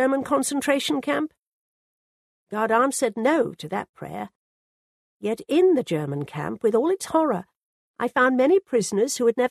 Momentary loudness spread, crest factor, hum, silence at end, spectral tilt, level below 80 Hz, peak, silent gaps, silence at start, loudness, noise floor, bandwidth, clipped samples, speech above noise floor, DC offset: 13 LU; 18 dB; none; 0 s; -4.5 dB/octave; -66 dBFS; -6 dBFS; 1.39-2.47 s, 3.89-3.94 s, 4.35-5.20 s, 7.56-7.94 s; 0 s; -23 LUFS; under -90 dBFS; 13.5 kHz; under 0.1%; over 68 dB; under 0.1%